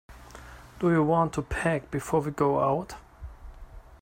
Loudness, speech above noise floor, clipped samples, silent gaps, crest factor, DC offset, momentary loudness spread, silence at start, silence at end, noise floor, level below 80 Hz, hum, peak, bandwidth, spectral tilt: -27 LUFS; 21 dB; under 0.1%; none; 18 dB; under 0.1%; 23 LU; 0.1 s; 0.05 s; -47 dBFS; -46 dBFS; none; -10 dBFS; 16 kHz; -7 dB/octave